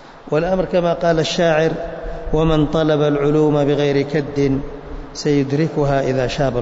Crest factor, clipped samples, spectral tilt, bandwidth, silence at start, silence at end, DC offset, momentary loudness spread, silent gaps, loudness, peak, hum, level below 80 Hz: 12 dB; under 0.1%; -6.5 dB/octave; 7.8 kHz; 0 s; 0 s; under 0.1%; 8 LU; none; -17 LUFS; -6 dBFS; none; -34 dBFS